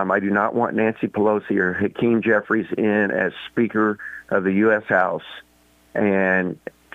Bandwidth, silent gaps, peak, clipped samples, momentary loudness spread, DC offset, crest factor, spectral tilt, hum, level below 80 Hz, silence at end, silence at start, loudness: 6.8 kHz; none; -6 dBFS; under 0.1%; 9 LU; under 0.1%; 16 dB; -8.5 dB/octave; none; -62 dBFS; 0.4 s; 0 s; -21 LUFS